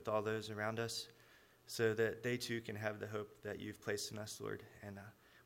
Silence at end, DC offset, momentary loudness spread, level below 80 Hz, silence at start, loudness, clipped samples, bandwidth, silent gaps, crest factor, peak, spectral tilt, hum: 0.05 s; under 0.1%; 15 LU; -76 dBFS; 0 s; -42 LUFS; under 0.1%; 16 kHz; none; 20 dB; -22 dBFS; -4.5 dB/octave; none